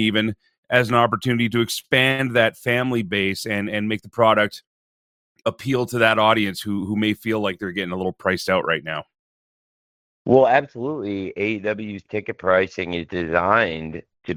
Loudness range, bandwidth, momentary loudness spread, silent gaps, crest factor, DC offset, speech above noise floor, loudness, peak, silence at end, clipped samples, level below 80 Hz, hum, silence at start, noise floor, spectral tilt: 3 LU; 18 kHz; 11 LU; 0.58-0.63 s, 4.67-5.35 s, 9.19-10.25 s; 20 dB; under 0.1%; over 69 dB; -21 LUFS; -2 dBFS; 0 s; under 0.1%; -58 dBFS; none; 0 s; under -90 dBFS; -5.5 dB/octave